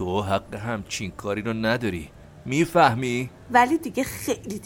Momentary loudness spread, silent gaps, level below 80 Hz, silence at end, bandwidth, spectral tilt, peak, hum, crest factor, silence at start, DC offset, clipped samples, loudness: 12 LU; none; -50 dBFS; 0 s; 17 kHz; -5 dB/octave; -4 dBFS; none; 20 dB; 0 s; under 0.1%; under 0.1%; -24 LUFS